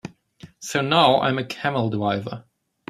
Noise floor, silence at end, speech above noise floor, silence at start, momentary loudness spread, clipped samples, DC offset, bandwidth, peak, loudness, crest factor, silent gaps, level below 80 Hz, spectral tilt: -48 dBFS; 0.5 s; 27 dB; 0.05 s; 20 LU; under 0.1%; under 0.1%; 15 kHz; -2 dBFS; -21 LUFS; 22 dB; none; -62 dBFS; -5 dB/octave